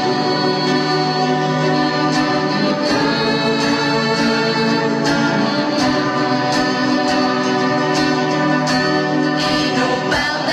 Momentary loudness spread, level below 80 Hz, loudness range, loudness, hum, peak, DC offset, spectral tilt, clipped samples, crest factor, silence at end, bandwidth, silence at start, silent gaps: 1 LU; -48 dBFS; 0 LU; -16 LUFS; none; -4 dBFS; under 0.1%; -5 dB/octave; under 0.1%; 12 dB; 0 s; 13 kHz; 0 s; none